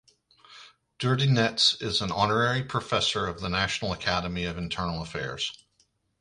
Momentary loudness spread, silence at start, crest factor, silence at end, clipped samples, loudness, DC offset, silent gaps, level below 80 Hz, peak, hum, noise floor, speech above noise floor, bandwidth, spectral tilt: 10 LU; 0.5 s; 20 dB; 0.65 s; under 0.1%; -26 LUFS; under 0.1%; none; -50 dBFS; -8 dBFS; none; -69 dBFS; 42 dB; 11.5 kHz; -4 dB/octave